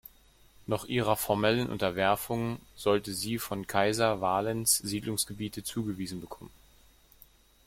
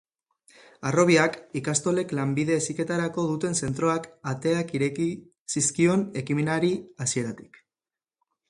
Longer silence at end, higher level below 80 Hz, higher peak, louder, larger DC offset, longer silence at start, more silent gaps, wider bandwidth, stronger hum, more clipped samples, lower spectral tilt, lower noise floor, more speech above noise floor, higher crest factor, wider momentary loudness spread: about the same, 1.15 s vs 1.1 s; about the same, -58 dBFS vs -62 dBFS; second, -10 dBFS vs -6 dBFS; second, -30 LUFS vs -26 LUFS; neither; second, 0.6 s vs 0.8 s; second, none vs 5.40-5.46 s; first, 16.5 kHz vs 11.5 kHz; neither; neither; about the same, -4 dB/octave vs -5 dB/octave; second, -60 dBFS vs under -90 dBFS; second, 30 dB vs over 65 dB; about the same, 22 dB vs 20 dB; about the same, 10 LU vs 9 LU